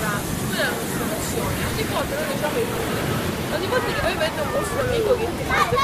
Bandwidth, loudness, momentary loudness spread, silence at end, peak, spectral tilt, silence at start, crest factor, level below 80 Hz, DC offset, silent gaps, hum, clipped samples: 15.5 kHz; -23 LUFS; 4 LU; 0 s; -6 dBFS; -4.5 dB/octave; 0 s; 16 dB; -38 dBFS; under 0.1%; none; none; under 0.1%